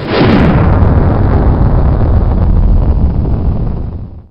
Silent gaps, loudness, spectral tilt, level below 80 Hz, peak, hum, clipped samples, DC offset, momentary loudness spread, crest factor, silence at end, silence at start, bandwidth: none; -11 LUFS; -10 dB/octave; -12 dBFS; 0 dBFS; none; 0.2%; under 0.1%; 9 LU; 8 dB; 0.1 s; 0 s; 5.6 kHz